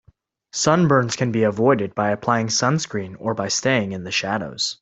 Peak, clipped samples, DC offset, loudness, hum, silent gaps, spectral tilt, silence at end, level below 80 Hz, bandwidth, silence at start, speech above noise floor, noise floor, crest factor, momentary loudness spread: -2 dBFS; under 0.1%; under 0.1%; -20 LUFS; none; none; -4.5 dB/octave; 0.05 s; -58 dBFS; 8.4 kHz; 0.55 s; 38 dB; -58 dBFS; 18 dB; 8 LU